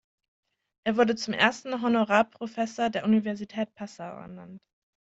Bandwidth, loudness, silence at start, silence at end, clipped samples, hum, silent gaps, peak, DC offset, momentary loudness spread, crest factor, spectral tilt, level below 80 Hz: 8 kHz; -26 LUFS; 0.85 s; 0.6 s; under 0.1%; none; none; -6 dBFS; under 0.1%; 17 LU; 22 dB; -5 dB/octave; -70 dBFS